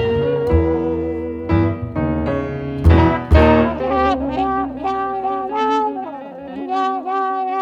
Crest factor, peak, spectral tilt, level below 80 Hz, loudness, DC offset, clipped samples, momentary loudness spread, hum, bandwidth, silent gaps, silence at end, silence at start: 16 dB; 0 dBFS; -8.5 dB/octave; -26 dBFS; -18 LUFS; under 0.1%; under 0.1%; 10 LU; none; 7 kHz; none; 0 s; 0 s